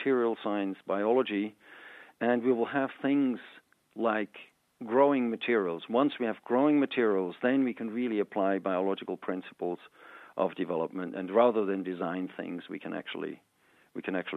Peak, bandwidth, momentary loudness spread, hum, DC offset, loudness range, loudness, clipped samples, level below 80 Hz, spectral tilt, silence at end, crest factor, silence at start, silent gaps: -10 dBFS; 4.2 kHz; 14 LU; none; under 0.1%; 4 LU; -30 LUFS; under 0.1%; -86 dBFS; -8 dB/octave; 0 s; 20 dB; 0 s; none